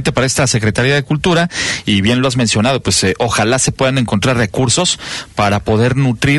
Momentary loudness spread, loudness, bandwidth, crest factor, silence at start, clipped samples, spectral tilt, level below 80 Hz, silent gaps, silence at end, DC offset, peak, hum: 3 LU; -13 LUFS; 12 kHz; 12 dB; 0 s; under 0.1%; -4 dB/octave; -36 dBFS; none; 0 s; under 0.1%; -2 dBFS; none